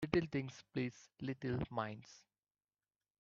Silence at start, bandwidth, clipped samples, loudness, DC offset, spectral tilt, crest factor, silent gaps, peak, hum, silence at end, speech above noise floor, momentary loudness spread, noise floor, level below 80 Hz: 0 s; 7.6 kHz; under 0.1%; -42 LUFS; under 0.1%; -6 dB/octave; 24 dB; none; -18 dBFS; 50 Hz at -70 dBFS; 1 s; over 48 dB; 11 LU; under -90 dBFS; -66 dBFS